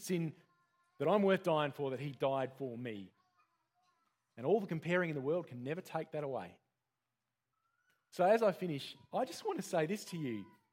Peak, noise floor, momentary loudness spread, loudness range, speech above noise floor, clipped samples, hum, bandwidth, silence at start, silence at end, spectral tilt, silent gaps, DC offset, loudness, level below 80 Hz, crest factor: -18 dBFS; -90 dBFS; 13 LU; 4 LU; 54 dB; under 0.1%; none; 16.5 kHz; 0 s; 0.25 s; -6 dB/octave; none; under 0.1%; -37 LUFS; -86 dBFS; 20 dB